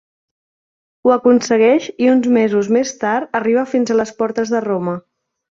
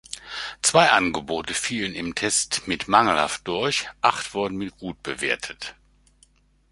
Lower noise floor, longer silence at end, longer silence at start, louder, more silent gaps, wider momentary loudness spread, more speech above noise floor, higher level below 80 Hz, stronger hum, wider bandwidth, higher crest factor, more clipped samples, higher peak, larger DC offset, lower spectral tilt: first, under -90 dBFS vs -60 dBFS; second, 0.6 s vs 1 s; first, 1.05 s vs 0.1 s; first, -16 LUFS vs -23 LUFS; neither; second, 7 LU vs 15 LU; first, over 75 dB vs 36 dB; second, -62 dBFS vs -54 dBFS; neither; second, 7.6 kHz vs 11.5 kHz; second, 14 dB vs 24 dB; neither; about the same, -2 dBFS vs -2 dBFS; neither; first, -5.5 dB/octave vs -2 dB/octave